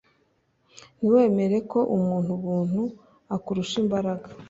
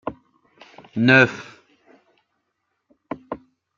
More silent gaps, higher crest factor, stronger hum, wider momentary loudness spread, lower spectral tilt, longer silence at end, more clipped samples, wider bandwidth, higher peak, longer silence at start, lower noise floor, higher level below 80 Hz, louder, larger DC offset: neither; about the same, 18 dB vs 22 dB; neither; second, 11 LU vs 23 LU; about the same, -7.5 dB/octave vs -6.5 dB/octave; second, 0.05 s vs 0.4 s; neither; about the same, 7.8 kHz vs 7.4 kHz; second, -8 dBFS vs -2 dBFS; first, 1 s vs 0.05 s; second, -68 dBFS vs -75 dBFS; about the same, -62 dBFS vs -62 dBFS; second, -25 LUFS vs -16 LUFS; neither